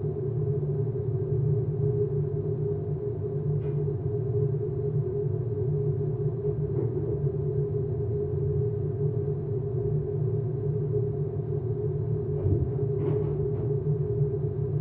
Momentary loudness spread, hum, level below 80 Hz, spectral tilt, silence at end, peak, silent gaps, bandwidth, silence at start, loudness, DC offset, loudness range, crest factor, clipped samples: 3 LU; none; -46 dBFS; -13.5 dB/octave; 0 s; -14 dBFS; none; 2.3 kHz; 0 s; -29 LUFS; under 0.1%; 1 LU; 12 dB; under 0.1%